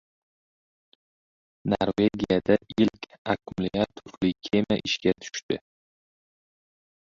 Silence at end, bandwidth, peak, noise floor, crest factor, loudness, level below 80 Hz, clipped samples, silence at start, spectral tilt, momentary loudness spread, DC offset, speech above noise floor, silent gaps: 1.5 s; 7.6 kHz; -6 dBFS; under -90 dBFS; 22 dB; -27 LUFS; -56 dBFS; under 0.1%; 1.65 s; -5.5 dB/octave; 9 LU; under 0.1%; over 64 dB; 3.18-3.25 s, 5.43-5.49 s